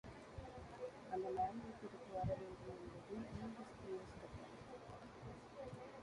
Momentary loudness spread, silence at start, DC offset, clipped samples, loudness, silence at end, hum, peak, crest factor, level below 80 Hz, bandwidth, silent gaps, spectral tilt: 11 LU; 0.05 s; under 0.1%; under 0.1%; -50 LUFS; 0 s; none; -32 dBFS; 18 dB; -66 dBFS; 11 kHz; none; -7 dB/octave